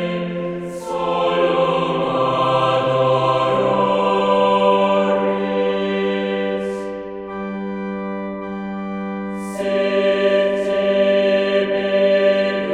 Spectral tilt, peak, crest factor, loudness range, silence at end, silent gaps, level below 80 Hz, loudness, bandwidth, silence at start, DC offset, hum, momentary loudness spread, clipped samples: -6.5 dB/octave; -4 dBFS; 16 dB; 8 LU; 0 s; none; -54 dBFS; -18 LUFS; 11 kHz; 0 s; under 0.1%; none; 11 LU; under 0.1%